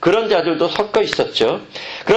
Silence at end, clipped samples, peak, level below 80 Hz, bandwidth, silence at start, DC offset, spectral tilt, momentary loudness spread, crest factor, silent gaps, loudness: 0 s; under 0.1%; -2 dBFS; -52 dBFS; 8.6 kHz; 0 s; under 0.1%; -4.5 dB/octave; 10 LU; 16 dB; none; -17 LUFS